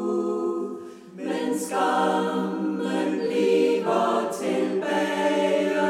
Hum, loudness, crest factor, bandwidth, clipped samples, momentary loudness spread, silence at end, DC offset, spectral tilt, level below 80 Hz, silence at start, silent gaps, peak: none; -24 LUFS; 14 dB; 15.5 kHz; under 0.1%; 8 LU; 0 s; under 0.1%; -5 dB/octave; -78 dBFS; 0 s; none; -10 dBFS